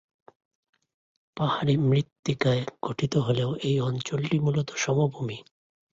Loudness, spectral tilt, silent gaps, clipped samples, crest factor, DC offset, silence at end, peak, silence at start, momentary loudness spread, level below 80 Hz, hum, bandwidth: -26 LUFS; -6 dB/octave; 2.19-2.23 s; under 0.1%; 16 dB; under 0.1%; 0.5 s; -10 dBFS; 1.35 s; 8 LU; -60 dBFS; none; 7.8 kHz